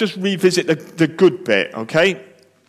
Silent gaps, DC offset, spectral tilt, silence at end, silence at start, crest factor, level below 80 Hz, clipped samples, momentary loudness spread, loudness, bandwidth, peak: none; under 0.1%; -5 dB/octave; 0.45 s; 0 s; 14 dB; -64 dBFS; under 0.1%; 5 LU; -17 LUFS; 14.5 kHz; -4 dBFS